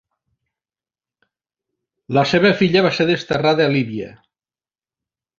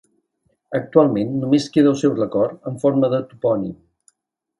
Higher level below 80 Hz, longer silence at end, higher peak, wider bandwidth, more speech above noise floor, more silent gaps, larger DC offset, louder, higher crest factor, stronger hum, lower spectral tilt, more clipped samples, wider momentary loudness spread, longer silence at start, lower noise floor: about the same, -56 dBFS vs -60 dBFS; first, 1.3 s vs 0.85 s; about the same, -2 dBFS vs 0 dBFS; second, 7.6 kHz vs 11.5 kHz; first, over 74 dB vs 56 dB; neither; neither; about the same, -17 LUFS vs -19 LUFS; about the same, 18 dB vs 20 dB; neither; about the same, -6.5 dB/octave vs -7.5 dB/octave; neither; first, 11 LU vs 8 LU; first, 2.1 s vs 0.7 s; first, under -90 dBFS vs -74 dBFS